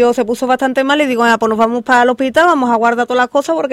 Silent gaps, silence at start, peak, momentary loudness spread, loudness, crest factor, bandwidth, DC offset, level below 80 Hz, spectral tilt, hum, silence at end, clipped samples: none; 0 s; 0 dBFS; 4 LU; -13 LUFS; 12 dB; 15.5 kHz; under 0.1%; -54 dBFS; -4 dB/octave; none; 0 s; under 0.1%